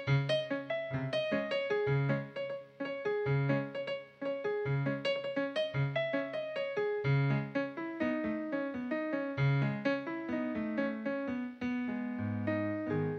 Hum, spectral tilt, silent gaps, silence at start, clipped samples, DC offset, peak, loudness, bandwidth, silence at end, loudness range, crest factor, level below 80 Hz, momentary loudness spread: none; -8 dB/octave; none; 0 s; under 0.1%; under 0.1%; -18 dBFS; -35 LUFS; 6.4 kHz; 0 s; 2 LU; 16 dB; -66 dBFS; 7 LU